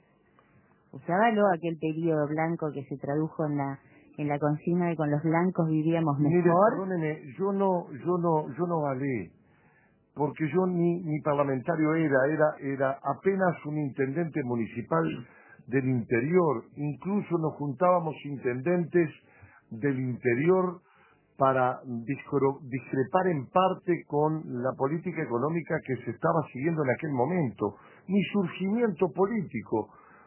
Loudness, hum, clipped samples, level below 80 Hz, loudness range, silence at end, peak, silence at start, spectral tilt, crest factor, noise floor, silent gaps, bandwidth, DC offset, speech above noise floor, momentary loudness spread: -28 LUFS; none; under 0.1%; -68 dBFS; 4 LU; 0.4 s; -8 dBFS; 0.95 s; -7.5 dB/octave; 20 dB; -64 dBFS; none; 3.2 kHz; under 0.1%; 36 dB; 9 LU